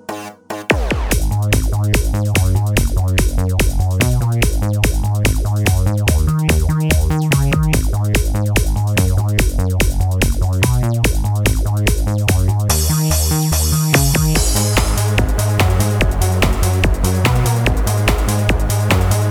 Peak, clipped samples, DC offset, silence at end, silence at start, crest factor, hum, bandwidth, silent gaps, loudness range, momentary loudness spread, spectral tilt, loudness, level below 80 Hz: 0 dBFS; under 0.1%; under 0.1%; 0 s; 0.1 s; 14 dB; none; 19 kHz; none; 2 LU; 2 LU; -5 dB/octave; -16 LUFS; -20 dBFS